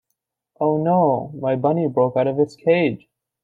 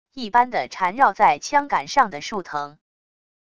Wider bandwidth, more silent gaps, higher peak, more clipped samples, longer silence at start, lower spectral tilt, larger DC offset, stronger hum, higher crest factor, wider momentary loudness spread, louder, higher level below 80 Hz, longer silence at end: second, 7.8 kHz vs 11 kHz; neither; second, -6 dBFS vs -2 dBFS; neither; first, 0.6 s vs 0.15 s; first, -9 dB/octave vs -3 dB/octave; second, under 0.1% vs 0.5%; neither; about the same, 16 dB vs 20 dB; second, 6 LU vs 13 LU; about the same, -20 LUFS vs -21 LUFS; about the same, -64 dBFS vs -60 dBFS; second, 0.5 s vs 0.8 s